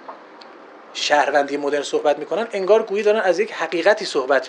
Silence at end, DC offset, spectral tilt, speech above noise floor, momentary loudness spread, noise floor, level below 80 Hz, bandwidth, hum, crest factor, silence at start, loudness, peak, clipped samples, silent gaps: 0 s; under 0.1%; -3 dB/octave; 23 dB; 7 LU; -42 dBFS; -76 dBFS; 10.5 kHz; none; 18 dB; 0 s; -19 LUFS; -2 dBFS; under 0.1%; none